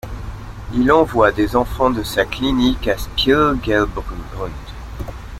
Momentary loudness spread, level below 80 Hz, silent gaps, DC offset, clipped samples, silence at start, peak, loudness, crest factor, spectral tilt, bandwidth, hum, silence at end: 17 LU; -30 dBFS; none; under 0.1%; under 0.1%; 0.05 s; -2 dBFS; -17 LUFS; 16 dB; -5.5 dB/octave; 16 kHz; none; 0 s